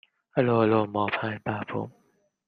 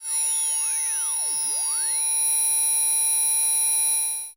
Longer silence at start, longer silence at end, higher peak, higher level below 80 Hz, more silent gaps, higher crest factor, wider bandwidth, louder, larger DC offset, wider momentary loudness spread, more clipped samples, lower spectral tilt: first, 0.35 s vs 0 s; first, 0.6 s vs 0.05 s; first, -8 dBFS vs -16 dBFS; first, -66 dBFS vs -76 dBFS; neither; first, 20 dB vs 8 dB; second, 5.2 kHz vs 16 kHz; second, -26 LUFS vs -20 LUFS; neither; first, 12 LU vs 4 LU; neither; first, -9.5 dB/octave vs 4 dB/octave